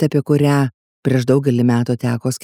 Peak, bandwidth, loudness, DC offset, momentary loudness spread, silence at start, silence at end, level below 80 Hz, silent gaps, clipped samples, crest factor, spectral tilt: -2 dBFS; 16 kHz; -17 LUFS; under 0.1%; 6 LU; 0 s; 0.05 s; -64 dBFS; 0.74-1.03 s; under 0.1%; 14 dB; -7 dB/octave